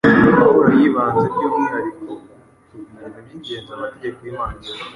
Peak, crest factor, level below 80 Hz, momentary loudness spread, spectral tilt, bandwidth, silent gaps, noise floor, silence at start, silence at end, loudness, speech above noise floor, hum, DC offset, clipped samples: -2 dBFS; 16 dB; -46 dBFS; 24 LU; -8 dB/octave; 11 kHz; none; -47 dBFS; 0.05 s; 0.05 s; -16 LUFS; 25 dB; none; under 0.1%; under 0.1%